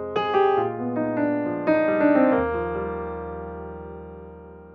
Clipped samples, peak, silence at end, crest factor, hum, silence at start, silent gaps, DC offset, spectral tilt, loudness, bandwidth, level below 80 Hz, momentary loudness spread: under 0.1%; -6 dBFS; 0 s; 18 dB; none; 0 s; none; under 0.1%; -8.5 dB/octave; -23 LUFS; 5.8 kHz; -46 dBFS; 20 LU